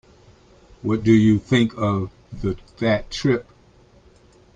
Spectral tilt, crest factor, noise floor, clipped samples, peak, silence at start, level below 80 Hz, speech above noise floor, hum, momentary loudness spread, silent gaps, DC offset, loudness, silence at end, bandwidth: -7 dB/octave; 18 dB; -52 dBFS; under 0.1%; -4 dBFS; 0.85 s; -46 dBFS; 33 dB; none; 12 LU; none; under 0.1%; -21 LUFS; 1.15 s; 9.2 kHz